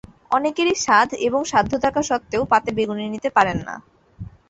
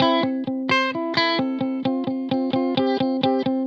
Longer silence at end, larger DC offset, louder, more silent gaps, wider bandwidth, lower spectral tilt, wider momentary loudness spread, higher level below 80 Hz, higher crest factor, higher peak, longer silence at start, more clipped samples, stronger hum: first, 0.2 s vs 0 s; neither; about the same, -20 LUFS vs -22 LUFS; neither; first, 8.2 kHz vs 7.2 kHz; second, -4 dB/octave vs -6 dB/octave; first, 13 LU vs 4 LU; first, -48 dBFS vs -72 dBFS; about the same, 20 dB vs 18 dB; about the same, -2 dBFS vs -4 dBFS; first, 0.3 s vs 0 s; neither; neither